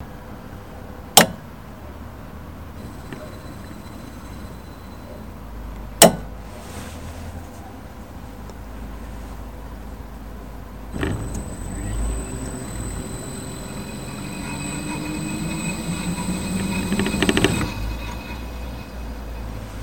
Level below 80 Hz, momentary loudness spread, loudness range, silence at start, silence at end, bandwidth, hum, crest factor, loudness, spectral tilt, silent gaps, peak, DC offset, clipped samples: -36 dBFS; 18 LU; 15 LU; 0 s; 0 s; 17.5 kHz; none; 26 dB; -23 LUFS; -3.5 dB/octave; none; 0 dBFS; 0.5%; under 0.1%